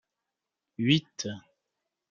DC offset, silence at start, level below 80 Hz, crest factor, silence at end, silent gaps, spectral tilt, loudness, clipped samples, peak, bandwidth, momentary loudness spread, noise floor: under 0.1%; 0.8 s; -70 dBFS; 24 dB; 0.7 s; none; -5 dB/octave; -29 LUFS; under 0.1%; -8 dBFS; 7.6 kHz; 20 LU; -87 dBFS